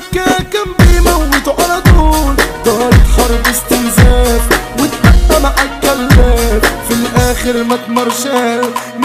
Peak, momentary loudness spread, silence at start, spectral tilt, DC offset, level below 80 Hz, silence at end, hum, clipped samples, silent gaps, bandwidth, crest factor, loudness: 0 dBFS; 6 LU; 0 s; -5 dB/octave; under 0.1%; -14 dBFS; 0 s; none; 0.2%; none; 16 kHz; 10 dB; -11 LUFS